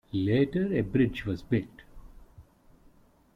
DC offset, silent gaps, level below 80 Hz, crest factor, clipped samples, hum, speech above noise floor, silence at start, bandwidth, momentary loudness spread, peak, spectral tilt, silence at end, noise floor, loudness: under 0.1%; none; -52 dBFS; 18 dB; under 0.1%; none; 32 dB; 0.15 s; 7.2 kHz; 7 LU; -12 dBFS; -9 dB/octave; 0.95 s; -60 dBFS; -28 LUFS